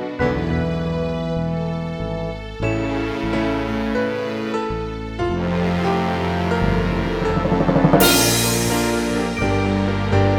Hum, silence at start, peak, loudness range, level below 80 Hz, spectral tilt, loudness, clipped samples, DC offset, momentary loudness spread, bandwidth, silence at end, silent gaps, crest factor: none; 0 s; -2 dBFS; 6 LU; -32 dBFS; -5 dB/octave; -20 LUFS; under 0.1%; under 0.1%; 10 LU; over 20 kHz; 0 s; none; 18 dB